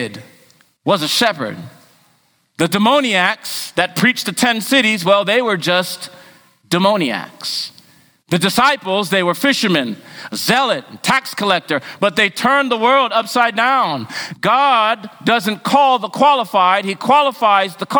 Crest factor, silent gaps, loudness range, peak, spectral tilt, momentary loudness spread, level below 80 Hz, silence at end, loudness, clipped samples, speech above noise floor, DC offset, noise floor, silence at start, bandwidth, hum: 16 dB; none; 3 LU; 0 dBFS; -3.5 dB/octave; 10 LU; -60 dBFS; 0 s; -15 LUFS; under 0.1%; 43 dB; under 0.1%; -59 dBFS; 0 s; over 20 kHz; none